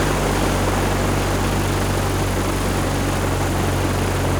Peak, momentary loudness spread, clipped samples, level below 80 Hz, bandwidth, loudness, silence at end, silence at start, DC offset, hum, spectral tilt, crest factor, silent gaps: -6 dBFS; 1 LU; under 0.1%; -28 dBFS; over 20 kHz; -20 LUFS; 0 s; 0 s; under 0.1%; none; -5 dB/octave; 14 dB; none